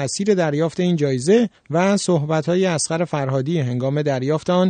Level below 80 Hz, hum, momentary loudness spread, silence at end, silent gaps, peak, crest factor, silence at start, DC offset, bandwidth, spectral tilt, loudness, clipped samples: -60 dBFS; none; 4 LU; 0 s; none; -4 dBFS; 14 dB; 0 s; under 0.1%; 9.4 kHz; -5.5 dB/octave; -19 LUFS; under 0.1%